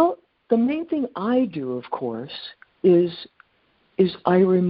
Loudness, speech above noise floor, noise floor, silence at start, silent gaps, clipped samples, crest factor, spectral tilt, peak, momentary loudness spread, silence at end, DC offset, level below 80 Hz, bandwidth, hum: -22 LUFS; 43 dB; -64 dBFS; 0 s; none; under 0.1%; 18 dB; -6.5 dB/octave; -4 dBFS; 18 LU; 0 s; under 0.1%; -64 dBFS; 5.2 kHz; none